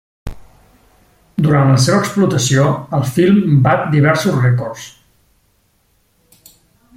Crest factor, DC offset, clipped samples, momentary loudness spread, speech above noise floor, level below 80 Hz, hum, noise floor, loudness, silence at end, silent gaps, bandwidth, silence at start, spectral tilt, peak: 14 dB; under 0.1%; under 0.1%; 20 LU; 46 dB; -44 dBFS; none; -59 dBFS; -13 LUFS; 2.1 s; none; 16 kHz; 0.25 s; -6 dB/octave; 0 dBFS